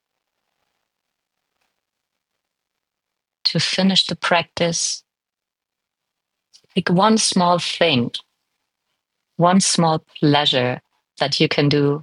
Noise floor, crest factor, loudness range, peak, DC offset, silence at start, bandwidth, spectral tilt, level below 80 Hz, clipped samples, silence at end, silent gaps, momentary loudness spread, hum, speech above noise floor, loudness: -86 dBFS; 20 dB; 4 LU; -2 dBFS; under 0.1%; 3.45 s; 11.5 kHz; -4 dB/octave; -66 dBFS; under 0.1%; 0 s; none; 9 LU; none; 68 dB; -18 LUFS